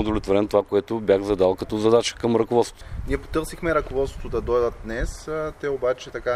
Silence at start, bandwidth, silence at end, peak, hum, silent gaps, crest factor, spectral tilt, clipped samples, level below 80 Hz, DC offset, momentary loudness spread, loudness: 0 s; 14.5 kHz; 0 s; -4 dBFS; none; none; 18 dB; -5.5 dB/octave; under 0.1%; -36 dBFS; under 0.1%; 10 LU; -23 LUFS